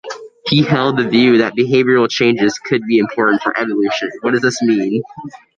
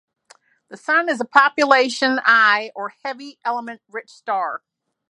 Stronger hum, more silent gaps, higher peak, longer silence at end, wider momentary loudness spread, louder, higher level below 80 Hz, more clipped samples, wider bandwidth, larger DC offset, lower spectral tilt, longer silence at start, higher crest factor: neither; neither; about the same, 0 dBFS vs 0 dBFS; second, 0.2 s vs 0.55 s; second, 8 LU vs 18 LU; first, -14 LUFS vs -18 LUFS; first, -56 dBFS vs -70 dBFS; neither; second, 9.2 kHz vs 11.5 kHz; neither; first, -5.5 dB/octave vs -2 dB/octave; second, 0.05 s vs 0.7 s; second, 14 dB vs 20 dB